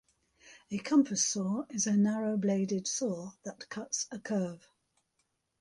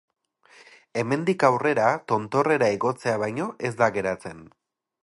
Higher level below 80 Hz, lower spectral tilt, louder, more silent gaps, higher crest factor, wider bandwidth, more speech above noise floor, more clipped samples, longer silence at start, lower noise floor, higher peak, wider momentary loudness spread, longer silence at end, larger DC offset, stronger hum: second, -76 dBFS vs -64 dBFS; second, -4.5 dB/octave vs -6 dB/octave; second, -32 LUFS vs -24 LUFS; neither; about the same, 18 dB vs 22 dB; about the same, 11.5 kHz vs 11.5 kHz; first, 48 dB vs 35 dB; neither; second, 0.45 s vs 0.95 s; first, -79 dBFS vs -58 dBFS; second, -16 dBFS vs -4 dBFS; first, 14 LU vs 9 LU; first, 1.05 s vs 0.6 s; neither; neither